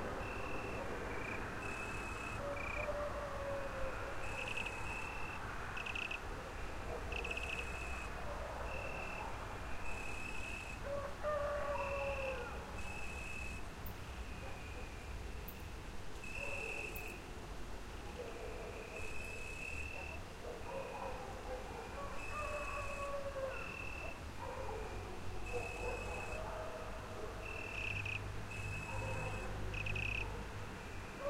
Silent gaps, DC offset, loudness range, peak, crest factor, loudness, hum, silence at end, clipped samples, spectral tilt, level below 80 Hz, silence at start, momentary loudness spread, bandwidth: none; under 0.1%; 4 LU; -26 dBFS; 18 dB; -44 LUFS; none; 0 s; under 0.1%; -4.5 dB/octave; -50 dBFS; 0 s; 8 LU; 16 kHz